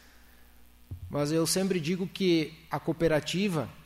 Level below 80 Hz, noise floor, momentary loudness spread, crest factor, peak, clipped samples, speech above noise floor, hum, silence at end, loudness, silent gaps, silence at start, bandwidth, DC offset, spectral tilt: -54 dBFS; -55 dBFS; 9 LU; 16 dB; -14 dBFS; under 0.1%; 26 dB; none; 0 s; -29 LUFS; none; 0.9 s; 16 kHz; under 0.1%; -5 dB/octave